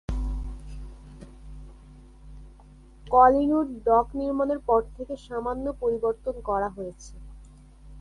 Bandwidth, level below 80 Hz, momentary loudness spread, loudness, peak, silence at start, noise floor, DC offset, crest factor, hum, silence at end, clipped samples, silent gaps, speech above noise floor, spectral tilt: 11.5 kHz; -40 dBFS; 27 LU; -25 LUFS; -6 dBFS; 0.1 s; -50 dBFS; under 0.1%; 20 dB; none; 0 s; under 0.1%; none; 26 dB; -7.5 dB/octave